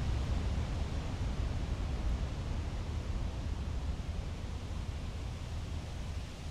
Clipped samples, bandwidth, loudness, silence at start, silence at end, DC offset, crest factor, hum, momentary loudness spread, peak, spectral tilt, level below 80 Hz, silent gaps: under 0.1%; 11.5 kHz; -39 LUFS; 0 s; 0 s; under 0.1%; 14 dB; none; 6 LU; -22 dBFS; -6 dB/octave; -38 dBFS; none